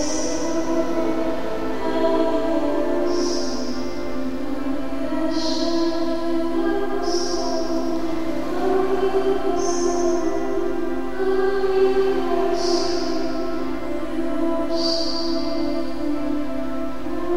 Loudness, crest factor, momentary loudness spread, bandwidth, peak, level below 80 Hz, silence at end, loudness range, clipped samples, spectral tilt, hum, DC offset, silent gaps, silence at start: -23 LUFS; 14 dB; 7 LU; 15 kHz; -8 dBFS; -42 dBFS; 0 s; 3 LU; under 0.1%; -4 dB/octave; none; 6%; none; 0 s